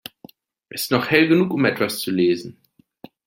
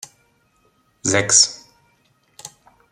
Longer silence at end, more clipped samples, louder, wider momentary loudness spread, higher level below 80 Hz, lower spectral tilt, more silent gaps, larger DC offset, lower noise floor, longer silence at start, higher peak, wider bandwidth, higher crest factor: first, 0.75 s vs 0.45 s; neither; second, -19 LUFS vs -15 LUFS; second, 18 LU vs 27 LU; about the same, -62 dBFS vs -64 dBFS; first, -5 dB/octave vs -1 dB/octave; neither; neither; second, -48 dBFS vs -62 dBFS; second, 0.75 s vs 1.05 s; about the same, -2 dBFS vs 0 dBFS; about the same, 17 kHz vs 15.5 kHz; about the same, 20 dB vs 24 dB